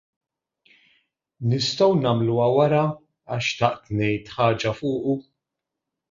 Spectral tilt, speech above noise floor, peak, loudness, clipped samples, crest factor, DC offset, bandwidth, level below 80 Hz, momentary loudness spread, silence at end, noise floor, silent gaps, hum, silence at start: -6 dB/octave; 63 dB; -4 dBFS; -22 LUFS; under 0.1%; 20 dB; under 0.1%; 7.6 kHz; -56 dBFS; 8 LU; 0.9 s; -84 dBFS; none; none; 1.4 s